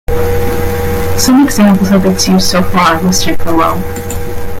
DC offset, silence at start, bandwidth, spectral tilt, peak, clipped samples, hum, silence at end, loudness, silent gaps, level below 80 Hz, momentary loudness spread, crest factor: under 0.1%; 0.1 s; 17 kHz; -5 dB/octave; 0 dBFS; under 0.1%; none; 0 s; -11 LUFS; none; -24 dBFS; 11 LU; 10 dB